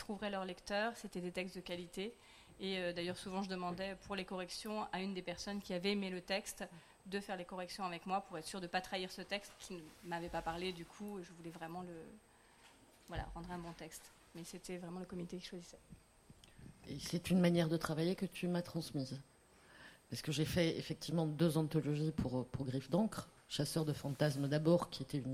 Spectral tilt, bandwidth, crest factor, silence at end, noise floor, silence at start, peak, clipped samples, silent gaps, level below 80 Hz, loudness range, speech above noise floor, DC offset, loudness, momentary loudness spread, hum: -5.5 dB/octave; 16 kHz; 22 dB; 0 s; -65 dBFS; 0 s; -20 dBFS; under 0.1%; none; -64 dBFS; 12 LU; 25 dB; under 0.1%; -41 LUFS; 16 LU; none